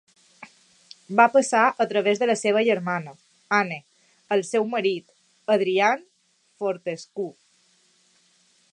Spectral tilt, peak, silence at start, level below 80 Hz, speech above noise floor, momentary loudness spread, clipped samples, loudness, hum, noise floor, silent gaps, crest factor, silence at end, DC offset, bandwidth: -4 dB/octave; -2 dBFS; 0.4 s; -80 dBFS; 44 dB; 15 LU; under 0.1%; -23 LUFS; none; -66 dBFS; none; 24 dB; 1.4 s; under 0.1%; 11 kHz